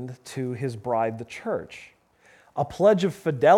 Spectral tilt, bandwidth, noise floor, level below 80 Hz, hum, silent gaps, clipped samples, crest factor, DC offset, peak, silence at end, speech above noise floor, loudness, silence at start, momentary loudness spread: -6.5 dB/octave; 14 kHz; -58 dBFS; -62 dBFS; none; none; under 0.1%; 20 dB; under 0.1%; -4 dBFS; 0 s; 34 dB; -26 LUFS; 0 s; 16 LU